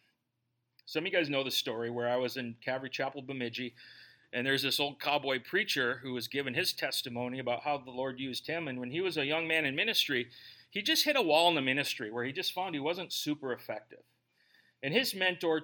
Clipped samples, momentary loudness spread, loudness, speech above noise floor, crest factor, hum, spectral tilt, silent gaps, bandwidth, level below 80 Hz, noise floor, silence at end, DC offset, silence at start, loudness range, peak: under 0.1%; 11 LU; -32 LUFS; 49 dB; 22 dB; none; -3 dB/octave; none; 17.5 kHz; -82 dBFS; -82 dBFS; 0 s; under 0.1%; 0.85 s; 6 LU; -12 dBFS